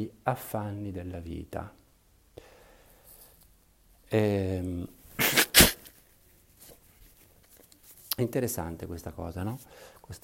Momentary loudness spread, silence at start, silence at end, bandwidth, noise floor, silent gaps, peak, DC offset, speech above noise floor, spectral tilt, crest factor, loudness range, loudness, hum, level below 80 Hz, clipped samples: 21 LU; 0 s; 0.05 s; 16.5 kHz; -63 dBFS; none; -4 dBFS; under 0.1%; 30 dB; -3 dB/octave; 28 dB; 15 LU; -27 LUFS; none; -48 dBFS; under 0.1%